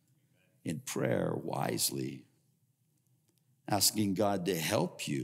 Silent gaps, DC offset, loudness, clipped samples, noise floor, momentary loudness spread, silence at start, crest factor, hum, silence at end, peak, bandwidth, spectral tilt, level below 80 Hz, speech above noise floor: none; under 0.1%; -32 LUFS; under 0.1%; -74 dBFS; 14 LU; 0.65 s; 22 dB; none; 0 s; -14 dBFS; 16 kHz; -4 dB/octave; -74 dBFS; 41 dB